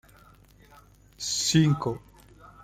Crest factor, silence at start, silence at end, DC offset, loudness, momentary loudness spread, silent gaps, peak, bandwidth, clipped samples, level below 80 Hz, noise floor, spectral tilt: 20 dB; 1.2 s; 0.65 s; under 0.1%; -25 LUFS; 14 LU; none; -10 dBFS; 15 kHz; under 0.1%; -56 dBFS; -55 dBFS; -4.5 dB/octave